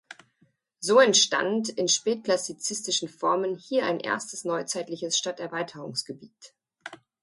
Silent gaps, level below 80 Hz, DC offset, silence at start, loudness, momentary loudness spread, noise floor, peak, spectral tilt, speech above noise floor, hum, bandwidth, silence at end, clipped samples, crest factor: none; -78 dBFS; under 0.1%; 0.1 s; -25 LUFS; 14 LU; -68 dBFS; -8 dBFS; -2 dB/octave; 41 dB; none; 11.5 kHz; 0.25 s; under 0.1%; 20 dB